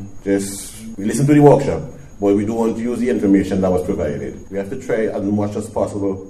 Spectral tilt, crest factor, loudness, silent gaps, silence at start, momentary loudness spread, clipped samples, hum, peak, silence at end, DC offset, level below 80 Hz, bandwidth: -7 dB/octave; 18 dB; -18 LUFS; none; 0 s; 15 LU; under 0.1%; none; 0 dBFS; 0 s; under 0.1%; -42 dBFS; 13.5 kHz